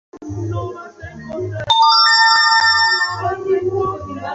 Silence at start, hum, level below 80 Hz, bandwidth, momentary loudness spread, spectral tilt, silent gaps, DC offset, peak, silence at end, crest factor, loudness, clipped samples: 0.15 s; none; -44 dBFS; 8 kHz; 20 LU; -3 dB/octave; none; under 0.1%; -2 dBFS; 0 s; 14 dB; -13 LUFS; under 0.1%